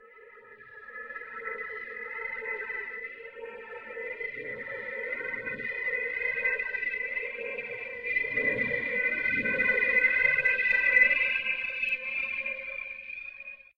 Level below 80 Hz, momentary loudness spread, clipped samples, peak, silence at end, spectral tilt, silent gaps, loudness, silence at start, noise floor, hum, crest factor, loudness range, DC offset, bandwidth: -62 dBFS; 18 LU; under 0.1%; -10 dBFS; 0.15 s; -4.5 dB/octave; none; -28 LUFS; 0 s; -52 dBFS; none; 20 dB; 13 LU; under 0.1%; 8.4 kHz